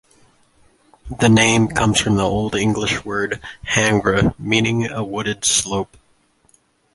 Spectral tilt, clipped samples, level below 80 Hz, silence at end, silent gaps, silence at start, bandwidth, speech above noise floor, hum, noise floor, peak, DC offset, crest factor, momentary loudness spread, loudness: -4 dB/octave; under 0.1%; -40 dBFS; 1.1 s; none; 1.05 s; 11.5 kHz; 41 dB; none; -59 dBFS; -2 dBFS; under 0.1%; 18 dB; 10 LU; -18 LUFS